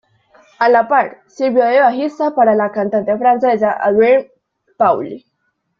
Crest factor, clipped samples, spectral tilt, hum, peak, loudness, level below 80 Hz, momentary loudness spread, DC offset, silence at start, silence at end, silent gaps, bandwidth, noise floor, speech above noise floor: 14 dB; under 0.1%; -7 dB/octave; none; -2 dBFS; -14 LUFS; -60 dBFS; 8 LU; under 0.1%; 0.6 s; 0.6 s; none; 7 kHz; -68 dBFS; 55 dB